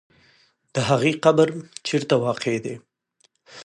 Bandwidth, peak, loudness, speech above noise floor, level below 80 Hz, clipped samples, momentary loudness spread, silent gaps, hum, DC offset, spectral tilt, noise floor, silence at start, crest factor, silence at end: 11.5 kHz; -4 dBFS; -22 LUFS; 44 dB; -62 dBFS; under 0.1%; 13 LU; none; none; under 0.1%; -5.5 dB/octave; -65 dBFS; 0.75 s; 20 dB; 0.05 s